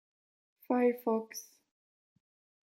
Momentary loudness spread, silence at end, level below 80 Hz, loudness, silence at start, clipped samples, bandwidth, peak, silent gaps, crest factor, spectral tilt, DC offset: 16 LU; 1.3 s; under -90 dBFS; -32 LUFS; 0.7 s; under 0.1%; 16.5 kHz; -16 dBFS; none; 20 dB; -5 dB/octave; under 0.1%